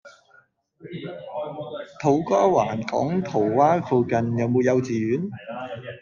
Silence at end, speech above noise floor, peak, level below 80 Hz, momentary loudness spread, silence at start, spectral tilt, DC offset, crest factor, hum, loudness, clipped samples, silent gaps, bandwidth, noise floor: 0 s; 36 dB; -6 dBFS; -62 dBFS; 16 LU; 0.05 s; -7.5 dB/octave; under 0.1%; 18 dB; none; -23 LUFS; under 0.1%; none; 7.2 kHz; -58 dBFS